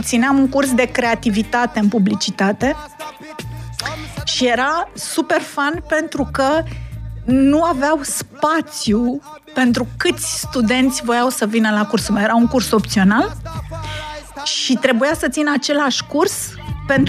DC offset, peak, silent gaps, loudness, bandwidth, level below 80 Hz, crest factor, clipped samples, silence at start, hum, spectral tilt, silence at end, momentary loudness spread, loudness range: under 0.1%; 0 dBFS; none; -17 LUFS; 15.5 kHz; -38 dBFS; 16 dB; under 0.1%; 0 s; none; -4 dB/octave; 0 s; 13 LU; 3 LU